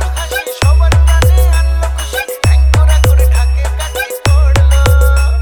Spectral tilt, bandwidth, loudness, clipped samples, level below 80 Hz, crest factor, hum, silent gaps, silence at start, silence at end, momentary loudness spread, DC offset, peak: -4.5 dB/octave; 20 kHz; -11 LUFS; under 0.1%; -10 dBFS; 8 dB; none; none; 0 s; 0 s; 8 LU; under 0.1%; 0 dBFS